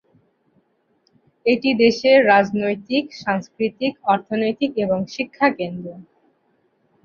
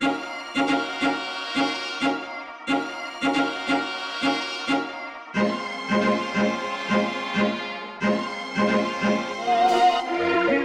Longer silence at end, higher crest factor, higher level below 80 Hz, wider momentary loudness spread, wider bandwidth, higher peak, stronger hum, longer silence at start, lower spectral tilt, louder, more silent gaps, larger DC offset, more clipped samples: first, 1 s vs 0 s; about the same, 18 dB vs 16 dB; about the same, -62 dBFS vs -62 dBFS; first, 12 LU vs 8 LU; second, 7 kHz vs 12 kHz; first, -2 dBFS vs -8 dBFS; neither; first, 1.45 s vs 0 s; about the same, -5.5 dB/octave vs -4.5 dB/octave; first, -19 LUFS vs -24 LUFS; neither; neither; neither